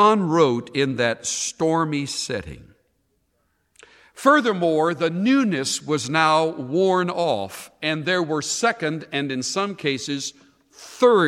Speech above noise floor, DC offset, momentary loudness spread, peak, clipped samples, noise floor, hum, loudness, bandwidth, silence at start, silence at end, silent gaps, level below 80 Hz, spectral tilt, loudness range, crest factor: 48 dB; under 0.1%; 9 LU; -4 dBFS; under 0.1%; -69 dBFS; none; -21 LUFS; 15.5 kHz; 0 s; 0 s; none; -60 dBFS; -4 dB/octave; 5 LU; 18 dB